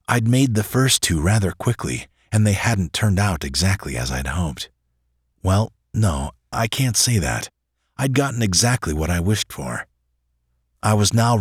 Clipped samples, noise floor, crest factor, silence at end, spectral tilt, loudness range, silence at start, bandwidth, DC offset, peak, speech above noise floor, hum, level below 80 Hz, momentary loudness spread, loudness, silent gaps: under 0.1%; -69 dBFS; 18 dB; 0 s; -4.5 dB/octave; 3 LU; 0.1 s; 16.5 kHz; under 0.1%; -2 dBFS; 50 dB; none; -36 dBFS; 11 LU; -20 LUFS; none